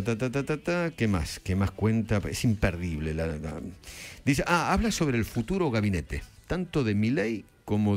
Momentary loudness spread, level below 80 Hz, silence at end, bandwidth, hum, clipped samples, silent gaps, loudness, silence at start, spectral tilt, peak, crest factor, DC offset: 11 LU; -42 dBFS; 0 s; 16 kHz; none; under 0.1%; none; -28 LUFS; 0 s; -6 dB/octave; -10 dBFS; 18 dB; under 0.1%